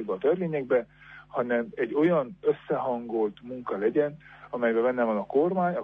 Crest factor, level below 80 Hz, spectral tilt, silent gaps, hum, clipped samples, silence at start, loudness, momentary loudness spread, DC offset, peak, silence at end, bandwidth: 14 dB; -66 dBFS; -9.5 dB/octave; none; 50 Hz at -60 dBFS; under 0.1%; 0 s; -27 LUFS; 9 LU; under 0.1%; -12 dBFS; 0 s; 4 kHz